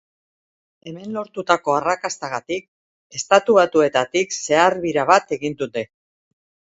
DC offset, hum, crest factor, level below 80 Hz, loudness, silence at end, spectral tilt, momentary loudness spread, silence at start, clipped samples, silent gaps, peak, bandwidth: under 0.1%; none; 20 dB; -62 dBFS; -19 LUFS; 0.9 s; -3.5 dB/octave; 14 LU; 0.85 s; under 0.1%; 2.68-3.10 s; 0 dBFS; 8 kHz